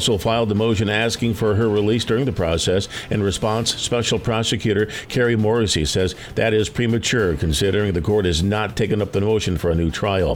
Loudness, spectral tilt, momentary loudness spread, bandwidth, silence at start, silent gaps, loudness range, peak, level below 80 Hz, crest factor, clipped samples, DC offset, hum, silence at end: -20 LUFS; -5 dB/octave; 3 LU; 17 kHz; 0 s; none; 1 LU; -6 dBFS; -36 dBFS; 12 dB; under 0.1%; under 0.1%; none; 0 s